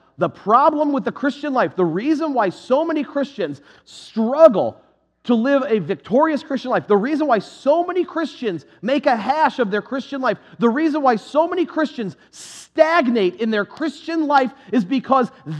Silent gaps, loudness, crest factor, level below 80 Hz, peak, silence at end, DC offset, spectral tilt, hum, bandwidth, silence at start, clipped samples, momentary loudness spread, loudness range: none; -19 LUFS; 18 dB; -70 dBFS; 0 dBFS; 0 s; under 0.1%; -6.5 dB/octave; none; 11 kHz; 0.2 s; under 0.1%; 11 LU; 2 LU